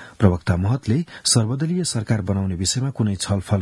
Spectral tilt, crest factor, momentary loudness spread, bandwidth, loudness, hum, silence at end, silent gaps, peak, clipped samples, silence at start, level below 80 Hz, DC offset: -5 dB/octave; 20 dB; 5 LU; 12 kHz; -21 LUFS; none; 0 s; none; 0 dBFS; under 0.1%; 0 s; -48 dBFS; under 0.1%